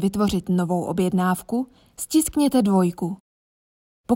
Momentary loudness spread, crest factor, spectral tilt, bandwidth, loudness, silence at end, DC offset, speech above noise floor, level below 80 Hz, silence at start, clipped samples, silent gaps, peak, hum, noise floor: 11 LU; 16 dB; -6 dB/octave; 16.5 kHz; -22 LUFS; 0 s; under 0.1%; over 69 dB; -50 dBFS; 0 s; under 0.1%; 3.20-4.04 s; -8 dBFS; none; under -90 dBFS